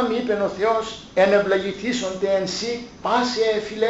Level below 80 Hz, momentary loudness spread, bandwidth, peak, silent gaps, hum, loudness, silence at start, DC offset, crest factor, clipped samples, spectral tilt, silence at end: -54 dBFS; 8 LU; 8.2 kHz; -6 dBFS; none; none; -22 LUFS; 0 s; under 0.1%; 16 dB; under 0.1%; -4 dB/octave; 0 s